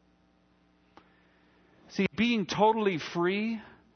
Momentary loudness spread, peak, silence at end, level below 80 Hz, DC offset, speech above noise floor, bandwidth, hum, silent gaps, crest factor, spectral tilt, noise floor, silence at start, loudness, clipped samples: 10 LU; -10 dBFS; 0.25 s; -66 dBFS; under 0.1%; 38 dB; 6.6 kHz; none; none; 22 dB; -5.5 dB/octave; -66 dBFS; 1.9 s; -29 LUFS; under 0.1%